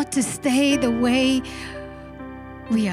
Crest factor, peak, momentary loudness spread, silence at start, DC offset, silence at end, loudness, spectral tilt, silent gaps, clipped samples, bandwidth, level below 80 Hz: 16 dB; -6 dBFS; 19 LU; 0 s; under 0.1%; 0 s; -20 LUFS; -4 dB/octave; none; under 0.1%; 14 kHz; -46 dBFS